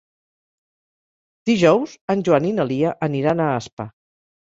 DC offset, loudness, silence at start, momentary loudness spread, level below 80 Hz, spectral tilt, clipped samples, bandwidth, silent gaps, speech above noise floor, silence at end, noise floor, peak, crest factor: under 0.1%; -19 LUFS; 1.45 s; 14 LU; -58 dBFS; -6.5 dB/octave; under 0.1%; 7.8 kHz; 2.01-2.08 s, 3.73-3.77 s; over 71 dB; 0.6 s; under -90 dBFS; -2 dBFS; 20 dB